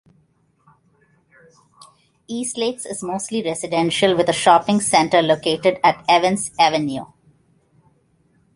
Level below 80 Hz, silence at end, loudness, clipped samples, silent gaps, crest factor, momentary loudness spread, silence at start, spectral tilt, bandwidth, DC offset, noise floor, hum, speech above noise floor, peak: -60 dBFS; 1.5 s; -18 LUFS; under 0.1%; none; 20 dB; 11 LU; 2.3 s; -3.5 dB/octave; 11.5 kHz; under 0.1%; -61 dBFS; none; 43 dB; -2 dBFS